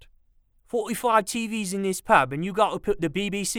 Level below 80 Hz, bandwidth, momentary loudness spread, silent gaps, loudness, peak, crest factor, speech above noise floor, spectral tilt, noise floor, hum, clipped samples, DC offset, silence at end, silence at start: -50 dBFS; 19 kHz; 8 LU; none; -24 LUFS; -4 dBFS; 22 dB; 37 dB; -4 dB/octave; -61 dBFS; none; under 0.1%; under 0.1%; 0 s; 0.75 s